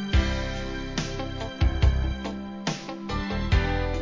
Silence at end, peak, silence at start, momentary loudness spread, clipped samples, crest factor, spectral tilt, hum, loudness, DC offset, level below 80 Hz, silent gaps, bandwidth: 0 s; -8 dBFS; 0 s; 8 LU; under 0.1%; 18 dB; -5.5 dB/octave; none; -28 LUFS; under 0.1%; -28 dBFS; none; 7.6 kHz